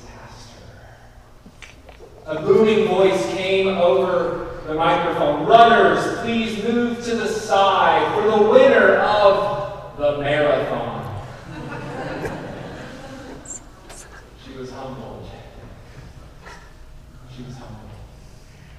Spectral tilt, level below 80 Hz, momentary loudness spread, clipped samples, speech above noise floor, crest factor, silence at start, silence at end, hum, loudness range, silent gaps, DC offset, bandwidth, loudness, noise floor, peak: -5 dB/octave; -44 dBFS; 24 LU; under 0.1%; 28 dB; 20 dB; 0.05 s; 0 s; none; 21 LU; none; 0.1%; 13 kHz; -17 LUFS; -45 dBFS; 0 dBFS